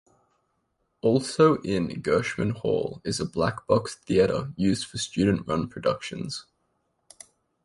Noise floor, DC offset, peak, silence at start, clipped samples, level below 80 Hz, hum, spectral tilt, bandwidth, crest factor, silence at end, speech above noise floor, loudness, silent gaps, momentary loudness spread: -74 dBFS; under 0.1%; -6 dBFS; 1.05 s; under 0.1%; -52 dBFS; none; -5.5 dB/octave; 11.5 kHz; 20 dB; 1.2 s; 49 dB; -26 LUFS; none; 9 LU